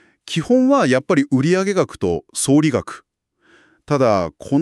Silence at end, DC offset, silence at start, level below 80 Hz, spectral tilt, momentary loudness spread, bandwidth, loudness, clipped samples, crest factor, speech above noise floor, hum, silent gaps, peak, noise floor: 0 s; under 0.1%; 0.25 s; -52 dBFS; -5.5 dB/octave; 10 LU; 13 kHz; -17 LUFS; under 0.1%; 14 dB; 42 dB; none; none; -4 dBFS; -59 dBFS